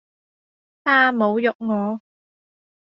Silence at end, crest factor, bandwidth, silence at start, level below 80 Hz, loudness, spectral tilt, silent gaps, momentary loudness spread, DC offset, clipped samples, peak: 0.85 s; 18 dB; 5.8 kHz; 0.85 s; -72 dBFS; -19 LUFS; -3 dB/octave; 1.55-1.59 s; 11 LU; under 0.1%; under 0.1%; -4 dBFS